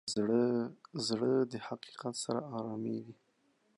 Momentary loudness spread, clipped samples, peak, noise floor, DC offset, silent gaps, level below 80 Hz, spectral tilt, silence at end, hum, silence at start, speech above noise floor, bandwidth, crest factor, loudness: 12 LU; under 0.1%; -18 dBFS; -74 dBFS; under 0.1%; none; -78 dBFS; -5 dB/octave; 0.65 s; none; 0.05 s; 39 dB; 11.5 kHz; 16 dB; -35 LUFS